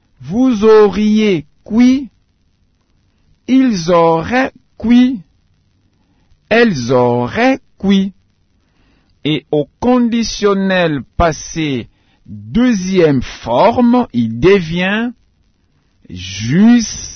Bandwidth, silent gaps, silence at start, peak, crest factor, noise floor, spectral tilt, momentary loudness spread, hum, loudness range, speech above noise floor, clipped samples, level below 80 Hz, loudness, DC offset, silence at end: 6.6 kHz; none; 0.2 s; 0 dBFS; 14 dB; -57 dBFS; -6 dB/octave; 12 LU; none; 3 LU; 45 dB; under 0.1%; -38 dBFS; -13 LUFS; under 0.1%; 0 s